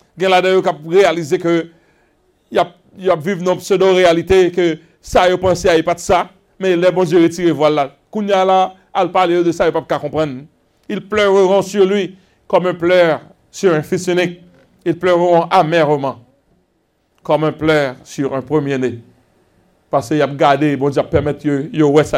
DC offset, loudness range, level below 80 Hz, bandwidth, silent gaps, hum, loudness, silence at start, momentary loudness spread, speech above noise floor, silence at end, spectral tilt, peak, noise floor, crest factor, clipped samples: under 0.1%; 4 LU; -44 dBFS; 15 kHz; none; none; -15 LUFS; 0.15 s; 10 LU; 48 dB; 0 s; -5.5 dB/octave; 0 dBFS; -62 dBFS; 14 dB; under 0.1%